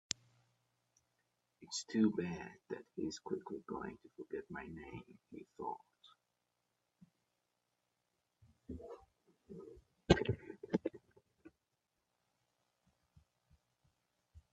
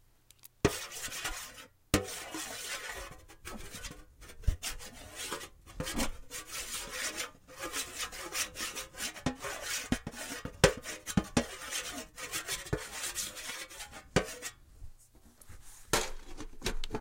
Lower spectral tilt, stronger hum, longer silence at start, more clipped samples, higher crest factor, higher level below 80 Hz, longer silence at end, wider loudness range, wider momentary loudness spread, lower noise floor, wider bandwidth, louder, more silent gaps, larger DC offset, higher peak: first, -5 dB/octave vs -3 dB/octave; first, 60 Hz at -75 dBFS vs none; first, 1.6 s vs 0.45 s; neither; about the same, 34 dB vs 30 dB; second, -62 dBFS vs -46 dBFS; first, 0.15 s vs 0 s; first, 17 LU vs 6 LU; first, 21 LU vs 16 LU; first, -87 dBFS vs -60 dBFS; second, 8.2 kHz vs 16 kHz; second, -41 LUFS vs -36 LUFS; neither; neither; second, -12 dBFS vs -6 dBFS